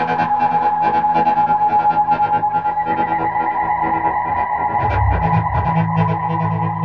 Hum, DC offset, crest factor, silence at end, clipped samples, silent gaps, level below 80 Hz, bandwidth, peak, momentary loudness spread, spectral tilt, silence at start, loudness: none; 0.3%; 12 dB; 0 s; under 0.1%; none; -32 dBFS; 5.8 kHz; -4 dBFS; 4 LU; -9 dB/octave; 0 s; -17 LUFS